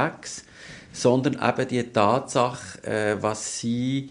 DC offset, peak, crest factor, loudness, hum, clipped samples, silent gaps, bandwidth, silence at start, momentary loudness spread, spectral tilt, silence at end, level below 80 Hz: under 0.1%; -4 dBFS; 20 dB; -24 LUFS; none; under 0.1%; none; 10.5 kHz; 0 s; 15 LU; -5 dB/octave; 0 s; -58 dBFS